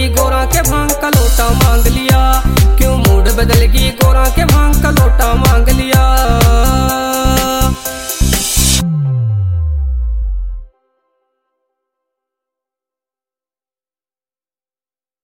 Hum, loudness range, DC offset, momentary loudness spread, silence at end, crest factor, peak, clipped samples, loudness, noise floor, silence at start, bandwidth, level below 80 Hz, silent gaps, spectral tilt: none; 10 LU; under 0.1%; 7 LU; 4.6 s; 12 dB; 0 dBFS; under 0.1%; -12 LUFS; under -90 dBFS; 0 s; 16.5 kHz; -14 dBFS; none; -4.5 dB/octave